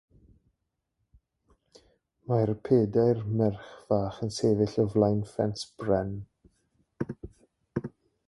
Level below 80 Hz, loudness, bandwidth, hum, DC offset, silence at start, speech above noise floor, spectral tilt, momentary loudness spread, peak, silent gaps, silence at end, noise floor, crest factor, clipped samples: -56 dBFS; -28 LUFS; 11.5 kHz; none; under 0.1%; 2.3 s; 54 dB; -7.5 dB/octave; 16 LU; -10 dBFS; none; 0.4 s; -81 dBFS; 20 dB; under 0.1%